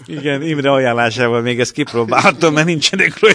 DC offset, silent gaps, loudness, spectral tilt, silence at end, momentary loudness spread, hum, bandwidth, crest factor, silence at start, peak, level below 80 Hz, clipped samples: under 0.1%; none; -14 LUFS; -4.5 dB/octave; 0 s; 6 LU; none; 11 kHz; 14 dB; 0 s; 0 dBFS; -56 dBFS; under 0.1%